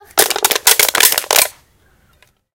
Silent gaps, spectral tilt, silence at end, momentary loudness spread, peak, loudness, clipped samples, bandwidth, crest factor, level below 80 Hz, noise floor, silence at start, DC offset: none; 1.5 dB/octave; 1.05 s; 4 LU; 0 dBFS; -11 LUFS; 0.5%; over 20 kHz; 16 dB; -52 dBFS; -54 dBFS; 0.15 s; under 0.1%